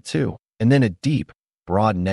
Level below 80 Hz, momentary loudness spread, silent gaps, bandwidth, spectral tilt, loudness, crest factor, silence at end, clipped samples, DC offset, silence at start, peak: -48 dBFS; 9 LU; none; 11.5 kHz; -7.5 dB/octave; -21 LUFS; 16 dB; 0 s; under 0.1%; under 0.1%; 0.05 s; -6 dBFS